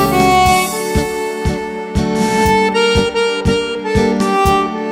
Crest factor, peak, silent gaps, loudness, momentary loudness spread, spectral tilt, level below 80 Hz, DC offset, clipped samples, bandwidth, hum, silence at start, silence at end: 14 dB; 0 dBFS; none; -14 LUFS; 8 LU; -4.5 dB/octave; -28 dBFS; under 0.1%; under 0.1%; 16.5 kHz; none; 0 s; 0 s